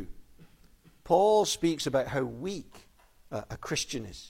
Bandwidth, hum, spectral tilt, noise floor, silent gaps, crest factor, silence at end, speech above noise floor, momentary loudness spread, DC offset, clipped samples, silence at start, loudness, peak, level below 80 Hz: 16.5 kHz; none; -4 dB/octave; -59 dBFS; none; 20 dB; 0 s; 30 dB; 17 LU; under 0.1%; under 0.1%; 0 s; -29 LUFS; -10 dBFS; -54 dBFS